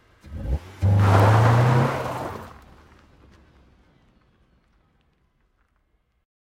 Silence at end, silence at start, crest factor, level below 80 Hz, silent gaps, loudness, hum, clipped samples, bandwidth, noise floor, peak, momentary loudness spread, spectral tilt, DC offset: 4 s; 0.3 s; 20 dB; -40 dBFS; none; -20 LUFS; none; under 0.1%; 14.5 kHz; -68 dBFS; -4 dBFS; 22 LU; -7.5 dB/octave; under 0.1%